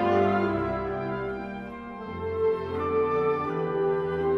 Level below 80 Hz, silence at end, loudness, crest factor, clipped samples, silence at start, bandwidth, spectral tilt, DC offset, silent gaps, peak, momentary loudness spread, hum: -50 dBFS; 0 s; -28 LUFS; 16 dB; under 0.1%; 0 s; 6.4 kHz; -8.5 dB/octave; under 0.1%; none; -10 dBFS; 12 LU; none